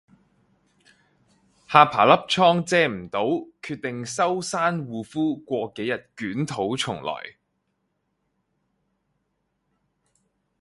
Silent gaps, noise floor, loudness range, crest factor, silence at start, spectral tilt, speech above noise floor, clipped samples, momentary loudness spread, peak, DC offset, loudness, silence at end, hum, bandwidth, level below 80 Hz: none; -75 dBFS; 12 LU; 26 dB; 1.7 s; -4.5 dB/octave; 52 dB; under 0.1%; 14 LU; 0 dBFS; under 0.1%; -23 LUFS; 3.3 s; none; 11.5 kHz; -64 dBFS